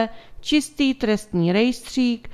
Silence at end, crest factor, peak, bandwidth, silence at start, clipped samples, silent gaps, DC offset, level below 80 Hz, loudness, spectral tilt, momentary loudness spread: 0 s; 16 dB; -6 dBFS; 14.5 kHz; 0 s; under 0.1%; none; under 0.1%; -48 dBFS; -21 LUFS; -5 dB/octave; 4 LU